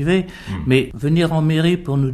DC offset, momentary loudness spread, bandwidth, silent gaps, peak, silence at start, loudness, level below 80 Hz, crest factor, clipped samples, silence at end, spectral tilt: under 0.1%; 5 LU; 13 kHz; none; -4 dBFS; 0 s; -18 LUFS; -40 dBFS; 14 dB; under 0.1%; 0 s; -7.5 dB/octave